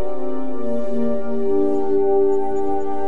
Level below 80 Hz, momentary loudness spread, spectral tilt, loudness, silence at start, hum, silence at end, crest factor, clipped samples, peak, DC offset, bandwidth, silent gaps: -50 dBFS; 9 LU; -8.5 dB/octave; -22 LUFS; 0 s; none; 0 s; 12 dB; under 0.1%; -8 dBFS; 10%; 7.2 kHz; none